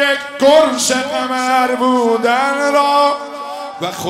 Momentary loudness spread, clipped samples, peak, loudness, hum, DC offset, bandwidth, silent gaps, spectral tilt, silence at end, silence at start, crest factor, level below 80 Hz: 12 LU; under 0.1%; 0 dBFS; -14 LUFS; none; under 0.1%; 16 kHz; none; -2.5 dB/octave; 0 s; 0 s; 14 dB; -60 dBFS